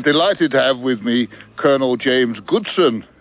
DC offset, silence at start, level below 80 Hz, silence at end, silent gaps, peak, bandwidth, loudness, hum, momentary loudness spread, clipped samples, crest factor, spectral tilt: under 0.1%; 0 s; -58 dBFS; 0.2 s; none; -4 dBFS; 4 kHz; -17 LUFS; none; 5 LU; under 0.1%; 14 dB; -9 dB/octave